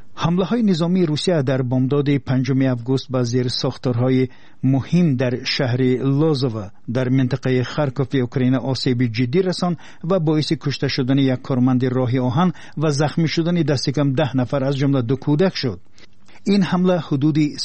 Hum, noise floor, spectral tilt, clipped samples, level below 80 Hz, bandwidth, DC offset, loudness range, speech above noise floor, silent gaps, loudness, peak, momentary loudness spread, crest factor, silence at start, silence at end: none; -49 dBFS; -7 dB/octave; under 0.1%; -52 dBFS; 8.8 kHz; 1%; 1 LU; 31 dB; none; -19 LUFS; -6 dBFS; 4 LU; 12 dB; 0 s; 0 s